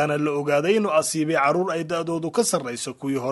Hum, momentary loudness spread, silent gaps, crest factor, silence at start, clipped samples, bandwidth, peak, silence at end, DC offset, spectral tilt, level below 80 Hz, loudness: none; 7 LU; none; 14 dB; 0 s; under 0.1%; 12 kHz; -8 dBFS; 0 s; under 0.1%; -4.5 dB/octave; -66 dBFS; -23 LUFS